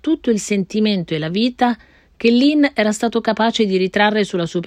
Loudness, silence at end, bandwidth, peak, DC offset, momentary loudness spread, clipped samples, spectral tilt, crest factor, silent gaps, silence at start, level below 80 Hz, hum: -17 LUFS; 0 s; 12 kHz; -2 dBFS; under 0.1%; 6 LU; under 0.1%; -5 dB/octave; 14 dB; none; 0.05 s; -54 dBFS; none